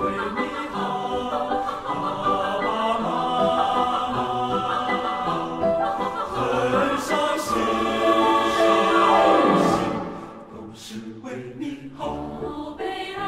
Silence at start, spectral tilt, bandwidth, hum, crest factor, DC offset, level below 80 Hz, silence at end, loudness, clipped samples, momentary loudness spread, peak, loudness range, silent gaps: 0 s; -5 dB/octave; 16 kHz; none; 16 dB; under 0.1%; -50 dBFS; 0 s; -22 LUFS; under 0.1%; 16 LU; -6 dBFS; 6 LU; none